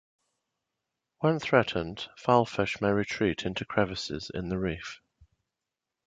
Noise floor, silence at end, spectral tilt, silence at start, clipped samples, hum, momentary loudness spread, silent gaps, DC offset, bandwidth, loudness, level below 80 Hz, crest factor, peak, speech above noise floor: -88 dBFS; 1.1 s; -6 dB/octave; 1.2 s; under 0.1%; none; 10 LU; none; under 0.1%; 9.2 kHz; -29 LUFS; -54 dBFS; 24 dB; -6 dBFS; 59 dB